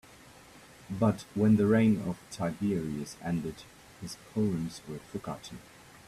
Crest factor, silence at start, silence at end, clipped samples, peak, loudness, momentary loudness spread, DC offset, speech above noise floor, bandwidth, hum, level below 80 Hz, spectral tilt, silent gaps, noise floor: 18 dB; 0.55 s; 0.45 s; under 0.1%; -14 dBFS; -30 LUFS; 19 LU; under 0.1%; 24 dB; 13.5 kHz; none; -60 dBFS; -7 dB/octave; none; -54 dBFS